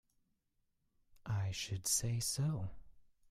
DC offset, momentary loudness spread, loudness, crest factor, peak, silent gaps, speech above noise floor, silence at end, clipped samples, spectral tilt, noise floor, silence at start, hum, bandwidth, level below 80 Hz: under 0.1%; 11 LU; -38 LUFS; 20 dB; -22 dBFS; none; 43 dB; 0.3 s; under 0.1%; -3.5 dB/octave; -81 dBFS; 1.25 s; none; 15.5 kHz; -62 dBFS